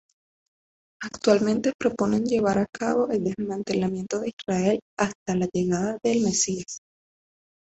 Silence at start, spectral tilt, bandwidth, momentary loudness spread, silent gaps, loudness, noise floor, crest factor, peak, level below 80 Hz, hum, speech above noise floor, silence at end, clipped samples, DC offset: 1 s; -5 dB/octave; 8.2 kHz; 8 LU; 1.74-1.79 s, 2.69-2.73 s, 4.33-4.37 s, 4.82-4.97 s, 5.15-5.26 s; -25 LUFS; under -90 dBFS; 20 dB; -6 dBFS; -58 dBFS; none; over 66 dB; 0.85 s; under 0.1%; under 0.1%